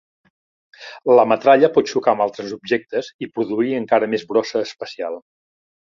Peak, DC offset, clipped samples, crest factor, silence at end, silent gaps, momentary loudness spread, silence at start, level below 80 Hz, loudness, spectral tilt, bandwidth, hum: -2 dBFS; under 0.1%; under 0.1%; 18 dB; 0.65 s; 3.14-3.19 s; 15 LU; 0.8 s; -66 dBFS; -19 LUFS; -5.5 dB/octave; 7.4 kHz; none